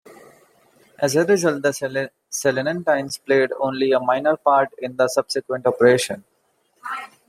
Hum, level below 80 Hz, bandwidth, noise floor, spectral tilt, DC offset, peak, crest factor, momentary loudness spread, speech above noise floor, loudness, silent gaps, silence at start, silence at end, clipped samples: none; -68 dBFS; 15.5 kHz; -65 dBFS; -4 dB/octave; under 0.1%; -2 dBFS; 20 dB; 11 LU; 45 dB; -20 LUFS; none; 0.1 s; 0.25 s; under 0.1%